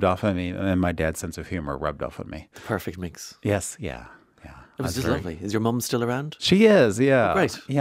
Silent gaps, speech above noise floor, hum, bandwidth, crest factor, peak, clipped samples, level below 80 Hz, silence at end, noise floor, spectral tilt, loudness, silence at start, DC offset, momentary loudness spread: none; 23 dB; none; 16 kHz; 18 dB; -6 dBFS; under 0.1%; -46 dBFS; 0 s; -47 dBFS; -5.5 dB/octave; -24 LUFS; 0 s; under 0.1%; 17 LU